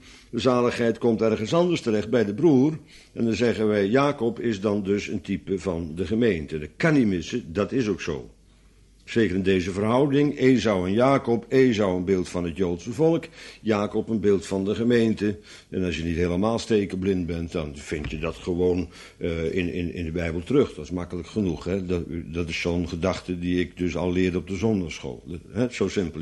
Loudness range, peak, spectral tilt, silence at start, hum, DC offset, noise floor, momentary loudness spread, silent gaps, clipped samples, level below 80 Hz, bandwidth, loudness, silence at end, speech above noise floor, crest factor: 5 LU; -6 dBFS; -6.5 dB/octave; 0.05 s; none; under 0.1%; -54 dBFS; 10 LU; none; under 0.1%; -46 dBFS; 11.5 kHz; -24 LUFS; 0 s; 31 dB; 18 dB